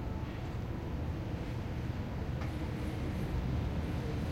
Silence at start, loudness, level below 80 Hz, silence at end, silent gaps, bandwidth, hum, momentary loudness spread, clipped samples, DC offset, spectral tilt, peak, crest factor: 0 s; -38 LUFS; -42 dBFS; 0 s; none; 16 kHz; none; 4 LU; under 0.1%; under 0.1%; -7.5 dB/octave; -24 dBFS; 12 dB